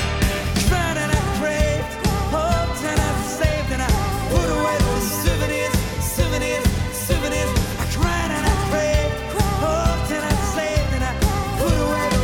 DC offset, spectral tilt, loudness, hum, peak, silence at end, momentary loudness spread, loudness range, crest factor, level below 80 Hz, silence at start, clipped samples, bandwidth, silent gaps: under 0.1%; -5 dB/octave; -21 LUFS; none; -4 dBFS; 0 s; 3 LU; 1 LU; 16 dB; -26 dBFS; 0 s; under 0.1%; 17.5 kHz; none